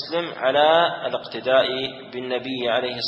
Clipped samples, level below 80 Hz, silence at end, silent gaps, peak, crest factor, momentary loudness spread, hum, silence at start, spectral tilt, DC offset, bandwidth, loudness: under 0.1%; -66 dBFS; 0 s; none; -4 dBFS; 18 dB; 11 LU; none; 0 s; -5.5 dB/octave; under 0.1%; 7 kHz; -21 LUFS